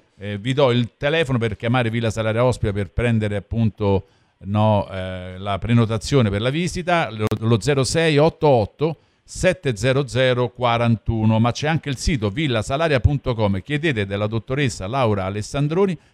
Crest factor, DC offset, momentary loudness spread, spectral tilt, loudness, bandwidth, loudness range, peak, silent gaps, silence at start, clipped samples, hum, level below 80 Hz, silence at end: 16 dB; under 0.1%; 6 LU; -6 dB/octave; -20 LUFS; 12 kHz; 2 LU; -2 dBFS; none; 0.2 s; under 0.1%; none; -38 dBFS; 0.2 s